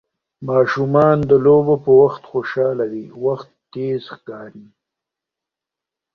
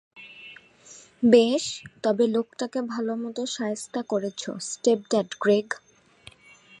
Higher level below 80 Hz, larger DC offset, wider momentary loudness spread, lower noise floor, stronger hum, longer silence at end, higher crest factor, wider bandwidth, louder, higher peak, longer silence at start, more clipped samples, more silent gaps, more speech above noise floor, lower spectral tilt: first, -56 dBFS vs -70 dBFS; neither; first, 21 LU vs 17 LU; first, -86 dBFS vs -53 dBFS; neither; first, 1.55 s vs 1.05 s; second, 16 dB vs 22 dB; second, 6.4 kHz vs 11.5 kHz; first, -16 LUFS vs -25 LUFS; about the same, -2 dBFS vs -4 dBFS; first, 0.4 s vs 0.15 s; neither; neither; first, 70 dB vs 29 dB; first, -9 dB/octave vs -4 dB/octave